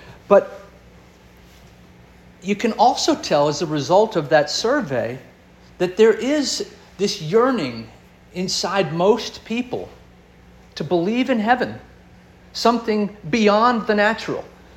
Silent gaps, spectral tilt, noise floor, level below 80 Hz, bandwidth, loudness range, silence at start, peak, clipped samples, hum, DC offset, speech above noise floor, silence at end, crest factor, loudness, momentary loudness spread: none; -4.5 dB/octave; -48 dBFS; -54 dBFS; 14 kHz; 4 LU; 0.05 s; -2 dBFS; under 0.1%; none; under 0.1%; 29 dB; 0.3 s; 20 dB; -19 LUFS; 15 LU